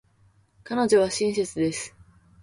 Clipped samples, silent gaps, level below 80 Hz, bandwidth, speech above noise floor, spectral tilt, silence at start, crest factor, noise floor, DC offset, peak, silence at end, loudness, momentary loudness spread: under 0.1%; none; -60 dBFS; 11.5 kHz; 38 dB; -4 dB/octave; 0.65 s; 18 dB; -61 dBFS; under 0.1%; -8 dBFS; 0.55 s; -24 LUFS; 12 LU